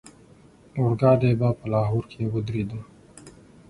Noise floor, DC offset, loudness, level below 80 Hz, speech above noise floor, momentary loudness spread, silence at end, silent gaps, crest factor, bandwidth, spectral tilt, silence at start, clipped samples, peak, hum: -52 dBFS; under 0.1%; -24 LUFS; -50 dBFS; 30 dB; 13 LU; 0.4 s; none; 20 dB; 11 kHz; -9 dB/octave; 0.05 s; under 0.1%; -6 dBFS; none